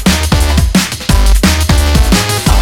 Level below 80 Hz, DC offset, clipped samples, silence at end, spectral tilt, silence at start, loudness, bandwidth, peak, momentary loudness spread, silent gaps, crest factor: -12 dBFS; under 0.1%; 0.2%; 0 s; -4.5 dB/octave; 0 s; -10 LUFS; 18 kHz; 0 dBFS; 2 LU; none; 8 dB